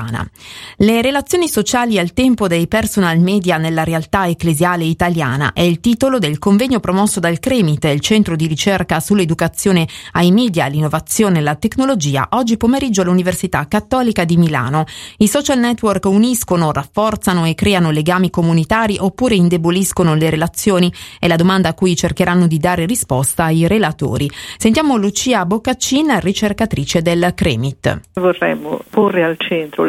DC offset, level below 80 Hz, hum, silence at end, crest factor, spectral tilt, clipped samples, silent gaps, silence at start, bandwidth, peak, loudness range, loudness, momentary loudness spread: under 0.1%; -38 dBFS; none; 0 s; 14 dB; -5 dB/octave; under 0.1%; none; 0 s; 15.5 kHz; 0 dBFS; 1 LU; -14 LUFS; 4 LU